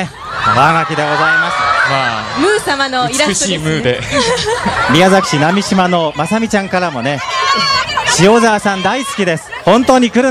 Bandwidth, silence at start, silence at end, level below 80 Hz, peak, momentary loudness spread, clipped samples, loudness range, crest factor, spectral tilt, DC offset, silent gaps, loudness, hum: 14.5 kHz; 0 s; 0 s; -40 dBFS; 0 dBFS; 7 LU; 0.2%; 1 LU; 12 dB; -4 dB/octave; under 0.1%; none; -12 LUFS; none